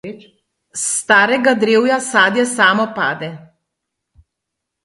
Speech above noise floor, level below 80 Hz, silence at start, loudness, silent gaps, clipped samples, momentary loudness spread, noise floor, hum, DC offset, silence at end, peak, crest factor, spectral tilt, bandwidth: 64 dB; -62 dBFS; 0.05 s; -14 LUFS; none; under 0.1%; 15 LU; -79 dBFS; none; under 0.1%; 1.45 s; 0 dBFS; 18 dB; -2.5 dB/octave; 11.5 kHz